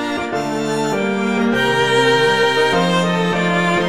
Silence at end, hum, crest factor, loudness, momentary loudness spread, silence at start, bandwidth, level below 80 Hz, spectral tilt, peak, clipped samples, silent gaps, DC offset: 0 s; none; 14 dB; -16 LUFS; 7 LU; 0 s; 15.5 kHz; -48 dBFS; -5 dB/octave; -2 dBFS; under 0.1%; none; 0.8%